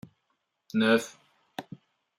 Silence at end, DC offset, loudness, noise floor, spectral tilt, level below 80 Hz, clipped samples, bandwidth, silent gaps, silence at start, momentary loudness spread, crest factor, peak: 0.55 s; under 0.1%; -26 LUFS; -78 dBFS; -4.5 dB/octave; -76 dBFS; under 0.1%; 15.5 kHz; none; 0.75 s; 20 LU; 22 dB; -10 dBFS